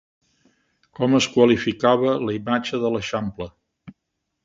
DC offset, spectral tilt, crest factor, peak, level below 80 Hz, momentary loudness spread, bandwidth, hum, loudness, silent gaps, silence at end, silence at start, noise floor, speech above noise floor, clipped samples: under 0.1%; -5.5 dB/octave; 20 dB; -2 dBFS; -54 dBFS; 12 LU; 7.8 kHz; none; -21 LUFS; none; 0.55 s; 1 s; -78 dBFS; 58 dB; under 0.1%